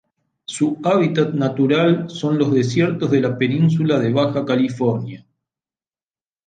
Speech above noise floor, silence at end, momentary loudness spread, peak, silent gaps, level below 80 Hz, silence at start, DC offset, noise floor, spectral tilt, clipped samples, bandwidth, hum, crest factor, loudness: over 73 dB; 1.3 s; 5 LU; -4 dBFS; none; -62 dBFS; 0.5 s; under 0.1%; under -90 dBFS; -7 dB/octave; under 0.1%; 9.4 kHz; none; 14 dB; -18 LUFS